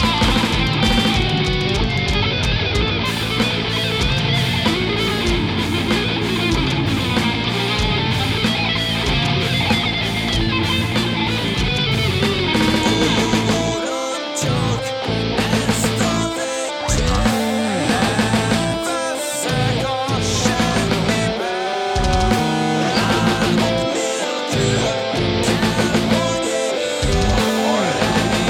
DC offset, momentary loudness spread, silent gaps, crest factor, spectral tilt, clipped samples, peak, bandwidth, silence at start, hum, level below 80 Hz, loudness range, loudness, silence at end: under 0.1%; 4 LU; none; 16 dB; -4.5 dB/octave; under 0.1%; -2 dBFS; 17.5 kHz; 0 s; none; -30 dBFS; 1 LU; -18 LUFS; 0 s